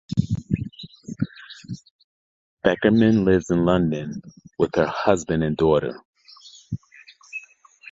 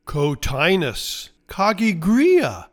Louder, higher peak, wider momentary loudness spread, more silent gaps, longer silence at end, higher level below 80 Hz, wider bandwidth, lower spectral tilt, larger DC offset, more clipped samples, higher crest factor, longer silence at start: about the same, -21 LUFS vs -19 LUFS; first, 0 dBFS vs -4 dBFS; first, 20 LU vs 12 LU; first, 1.91-2.57 s, 6.05-6.14 s vs none; first, 0.5 s vs 0.05 s; second, -46 dBFS vs -38 dBFS; second, 7.8 kHz vs 19 kHz; first, -7 dB/octave vs -5 dB/octave; neither; neither; first, 22 dB vs 14 dB; about the same, 0.1 s vs 0.05 s